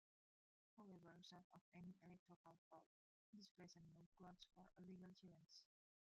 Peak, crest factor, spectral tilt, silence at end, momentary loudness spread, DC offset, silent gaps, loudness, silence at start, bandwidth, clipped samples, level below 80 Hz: -50 dBFS; 18 dB; -5 dB/octave; 0.4 s; 5 LU; under 0.1%; 1.44-1.50 s, 1.61-1.72 s, 2.19-2.26 s, 2.36-2.44 s, 2.58-2.71 s, 2.86-3.33 s, 3.51-3.55 s, 4.06-4.12 s; -66 LUFS; 0.75 s; 7.4 kHz; under 0.1%; under -90 dBFS